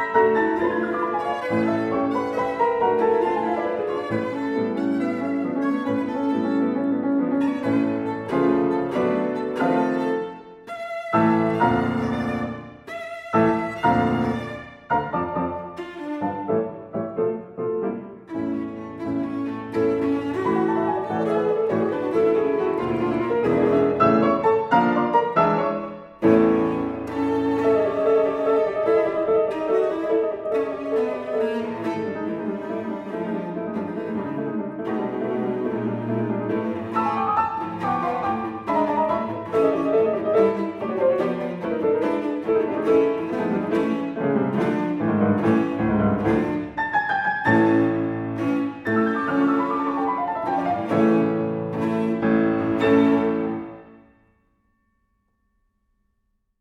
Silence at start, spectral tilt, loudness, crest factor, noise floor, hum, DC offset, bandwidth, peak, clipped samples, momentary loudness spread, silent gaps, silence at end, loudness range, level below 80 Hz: 0 s; -8 dB/octave; -23 LUFS; 18 dB; -71 dBFS; none; under 0.1%; 10 kHz; -4 dBFS; under 0.1%; 9 LU; none; 2.65 s; 6 LU; -54 dBFS